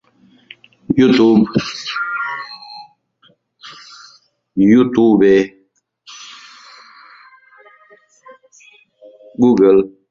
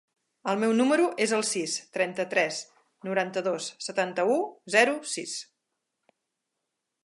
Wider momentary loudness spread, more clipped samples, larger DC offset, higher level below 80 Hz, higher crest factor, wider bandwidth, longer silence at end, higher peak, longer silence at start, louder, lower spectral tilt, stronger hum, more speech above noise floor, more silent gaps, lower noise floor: first, 25 LU vs 10 LU; neither; neither; first, -52 dBFS vs -84 dBFS; second, 16 dB vs 22 dB; second, 7.4 kHz vs 11.5 kHz; second, 0.25 s vs 1.6 s; first, -2 dBFS vs -8 dBFS; first, 0.9 s vs 0.45 s; first, -14 LUFS vs -27 LUFS; first, -6.5 dB/octave vs -3 dB/octave; neither; second, 48 dB vs 56 dB; neither; second, -60 dBFS vs -83 dBFS